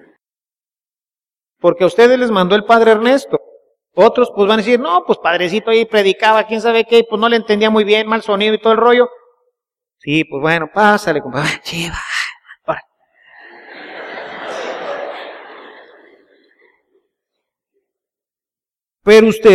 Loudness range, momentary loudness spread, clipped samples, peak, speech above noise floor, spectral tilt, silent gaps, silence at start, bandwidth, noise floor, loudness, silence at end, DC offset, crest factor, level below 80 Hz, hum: 16 LU; 16 LU; under 0.1%; 0 dBFS; over 78 dB; -5 dB/octave; none; 1.65 s; 13.5 kHz; under -90 dBFS; -13 LUFS; 0 s; under 0.1%; 14 dB; -50 dBFS; none